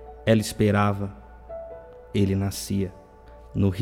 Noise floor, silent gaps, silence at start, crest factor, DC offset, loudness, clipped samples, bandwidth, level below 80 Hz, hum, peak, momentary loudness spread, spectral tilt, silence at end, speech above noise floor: -47 dBFS; none; 0 s; 20 dB; under 0.1%; -25 LUFS; under 0.1%; 16.5 kHz; -46 dBFS; none; -6 dBFS; 18 LU; -6.5 dB/octave; 0 s; 24 dB